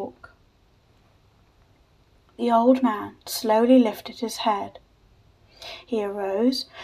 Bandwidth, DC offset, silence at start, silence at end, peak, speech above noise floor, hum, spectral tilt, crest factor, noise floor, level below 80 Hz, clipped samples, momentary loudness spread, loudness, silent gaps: 15.5 kHz; under 0.1%; 0 s; 0 s; -6 dBFS; 37 dB; none; -4.5 dB/octave; 18 dB; -60 dBFS; -62 dBFS; under 0.1%; 20 LU; -23 LUFS; none